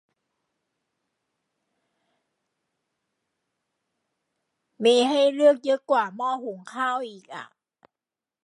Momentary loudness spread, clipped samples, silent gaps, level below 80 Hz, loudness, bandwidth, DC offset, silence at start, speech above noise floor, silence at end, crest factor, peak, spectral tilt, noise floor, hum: 18 LU; under 0.1%; none; -88 dBFS; -23 LUFS; 11.5 kHz; under 0.1%; 4.8 s; over 67 dB; 1 s; 20 dB; -8 dBFS; -3.5 dB/octave; under -90 dBFS; none